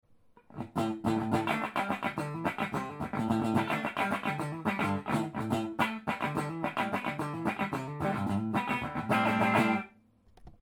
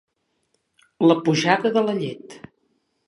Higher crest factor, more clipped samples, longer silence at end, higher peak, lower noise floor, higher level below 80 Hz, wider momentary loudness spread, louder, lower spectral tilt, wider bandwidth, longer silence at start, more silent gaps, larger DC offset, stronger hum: about the same, 20 dB vs 22 dB; neither; second, 0.1 s vs 0.7 s; second, -12 dBFS vs -2 dBFS; second, -62 dBFS vs -71 dBFS; first, -60 dBFS vs -70 dBFS; second, 7 LU vs 17 LU; second, -32 LUFS vs -20 LUFS; about the same, -6 dB/octave vs -5.5 dB/octave; first, 20 kHz vs 11 kHz; second, 0.5 s vs 1 s; neither; neither; neither